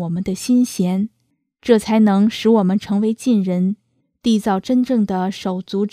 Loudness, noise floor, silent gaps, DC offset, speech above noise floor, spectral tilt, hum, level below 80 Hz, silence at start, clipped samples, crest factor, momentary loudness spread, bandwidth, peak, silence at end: -18 LUFS; -68 dBFS; none; under 0.1%; 51 dB; -6.5 dB/octave; none; -54 dBFS; 0 s; under 0.1%; 18 dB; 8 LU; 14.5 kHz; 0 dBFS; 0.05 s